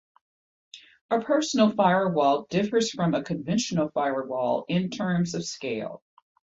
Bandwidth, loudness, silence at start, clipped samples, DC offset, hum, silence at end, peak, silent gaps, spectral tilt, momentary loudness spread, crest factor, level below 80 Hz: 8 kHz; -25 LUFS; 0.75 s; under 0.1%; under 0.1%; none; 0.5 s; -8 dBFS; 1.01-1.09 s; -5.5 dB/octave; 10 LU; 18 dB; -66 dBFS